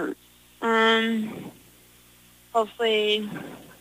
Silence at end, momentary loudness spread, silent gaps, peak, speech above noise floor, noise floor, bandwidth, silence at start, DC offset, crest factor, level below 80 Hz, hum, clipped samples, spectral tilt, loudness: 0.1 s; 21 LU; none; -10 dBFS; 29 dB; -54 dBFS; 15.5 kHz; 0 s; under 0.1%; 16 dB; -66 dBFS; 60 Hz at -60 dBFS; under 0.1%; -4 dB/octave; -24 LUFS